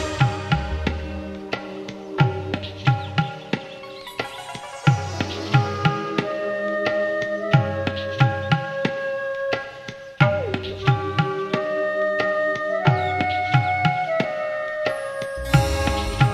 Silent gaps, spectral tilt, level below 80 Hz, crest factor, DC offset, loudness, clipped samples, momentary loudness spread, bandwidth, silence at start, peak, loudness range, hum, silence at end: none; -6.5 dB/octave; -38 dBFS; 20 dB; under 0.1%; -23 LUFS; under 0.1%; 10 LU; 14 kHz; 0 s; -2 dBFS; 4 LU; none; 0 s